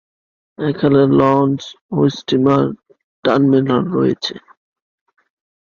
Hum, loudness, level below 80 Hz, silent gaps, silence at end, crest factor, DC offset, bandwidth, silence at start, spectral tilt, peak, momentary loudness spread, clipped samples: none; -16 LUFS; -54 dBFS; 1.81-1.89 s, 3.04-3.23 s; 1.4 s; 16 dB; under 0.1%; 7 kHz; 0.6 s; -7.5 dB/octave; -2 dBFS; 12 LU; under 0.1%